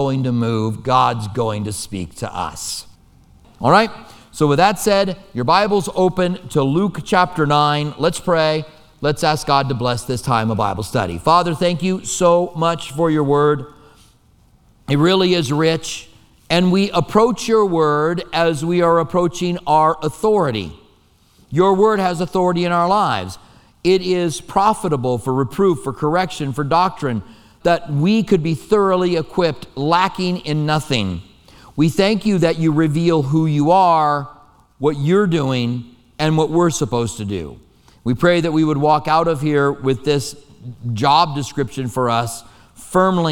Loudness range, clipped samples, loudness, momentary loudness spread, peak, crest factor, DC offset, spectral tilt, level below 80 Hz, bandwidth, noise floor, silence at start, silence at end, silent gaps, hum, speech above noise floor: 3 LU; under 0.1%; -17 LUFS; 9 LU; 0 dBFS; 16 dB; under 0.1%; -5.5 dB/octave; -46 dBFS; 17 kHz; -54 dBFS; 0 s; 0 s; none; none; 37 dB